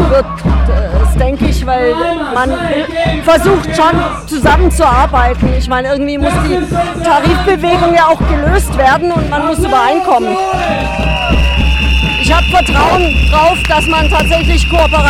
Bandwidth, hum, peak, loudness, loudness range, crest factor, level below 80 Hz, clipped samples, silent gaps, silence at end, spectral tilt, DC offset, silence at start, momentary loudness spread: 14 kHz; none; 0 dBFS; -11 LUFS; 2 LU; 10 dB; -16 dBFS; under 0.1%; none; 0 s; -5.5 dB/octave; under 0.1%; 0 s; 5 LU